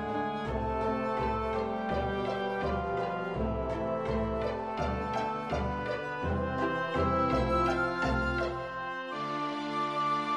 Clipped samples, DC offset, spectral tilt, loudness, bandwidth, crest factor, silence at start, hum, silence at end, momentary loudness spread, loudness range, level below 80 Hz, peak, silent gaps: under 0.1%; under 0.1%; -7 dB/octave; -32 LUFS; 11.5 kHz; 14 dB; 0 s; none; 0 s; 6 LU; 3 LU; -44 dBFS; -18 dBFS; none